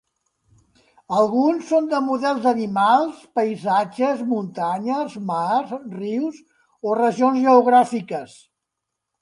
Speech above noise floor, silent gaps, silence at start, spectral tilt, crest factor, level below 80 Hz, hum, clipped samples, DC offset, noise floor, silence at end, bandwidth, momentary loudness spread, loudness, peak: 62 dB; none; 1.1 s; -6 dB/octave; 20 dB; -70 dBFS; none; under 0.1%; under 0.1%; -81 dBFS; 0.95 s; 11 kHz; 11 LU; -20 LUFS; -2 dBFS